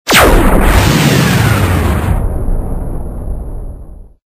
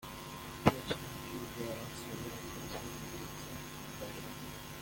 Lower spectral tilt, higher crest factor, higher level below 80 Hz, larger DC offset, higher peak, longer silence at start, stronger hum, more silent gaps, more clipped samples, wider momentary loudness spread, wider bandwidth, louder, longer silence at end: about the same, -5 dB/octave vs -4.5 dB/octave; second, 10 dB vs 32 dB; first, -16 dBFS vs -58 dBFS; neither; first, 0 dBFS vs -8 dBFS; about the same, 0.05 s vs 0 s; neither; neither; neither; first, 16 LU vs 12 LU; about the same, 16 kHz vs 17 kHz; first, -11 LUFS vs -40 LUFS; first, 0.35 s vs 0 s